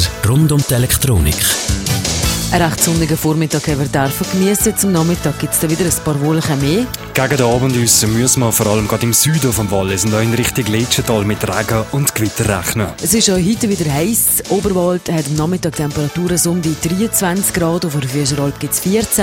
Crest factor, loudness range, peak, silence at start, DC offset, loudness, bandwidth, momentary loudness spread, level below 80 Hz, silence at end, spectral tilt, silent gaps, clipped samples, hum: 14 dB; 3 LU; 0 dBFS; 0 s; under 0.1%; -14 LUFS; 16.5 kHz; 5 LU; -32 dBFS; 0 s; -4 dB/octave; none; under 0.1%; none